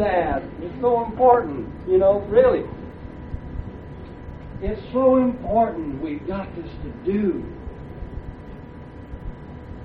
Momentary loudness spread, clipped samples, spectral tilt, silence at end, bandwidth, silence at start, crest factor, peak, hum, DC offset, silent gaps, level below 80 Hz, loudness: 21 LU; under 0.1%; -10.5 dB/octave; 0 s; 4.7 kHz; 0 s; 20 dB; -4 dBFS; none; under 0.1%; none; -38 dBFS; -21 LUFS